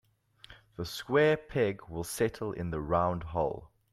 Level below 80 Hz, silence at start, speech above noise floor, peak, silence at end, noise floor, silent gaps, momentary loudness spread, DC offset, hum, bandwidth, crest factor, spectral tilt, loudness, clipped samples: -54 dBFS; 0.5 s; 27 dB; -14 dBFS; 0.25 s; -58 dBFS; none; 13 LU; under 0.1%; none; 15.5 kHz; 18 dB; -5.5 dB/octave; -31 LUFS; under 0.1%